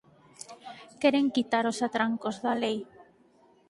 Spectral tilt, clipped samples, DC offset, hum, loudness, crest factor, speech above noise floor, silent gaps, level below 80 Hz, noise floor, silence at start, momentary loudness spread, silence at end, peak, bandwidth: -4 dB/octave; under 0.1%; under 0.1%; none; -28 LUFS; 22 dB; 34 dB; none; -74 dBFS; -62 dBFS; 0.5 s; 21 LU; 0.65 s; -10 dBFS; 11.5 kHz